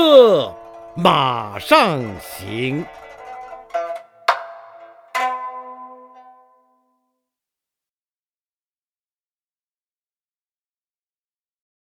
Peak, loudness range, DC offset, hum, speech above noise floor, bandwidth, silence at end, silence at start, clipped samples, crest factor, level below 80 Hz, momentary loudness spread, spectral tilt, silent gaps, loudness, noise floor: 0 dBFS; 12 LU; under 0.1%; none; over 72 dB; 18 kHz; 5.9 s; 0 s; under 0.1%; 22 dB; -60 dBFS; 23 LU; -5 dB/octave; none; -18 LUFS; under -90 dBFS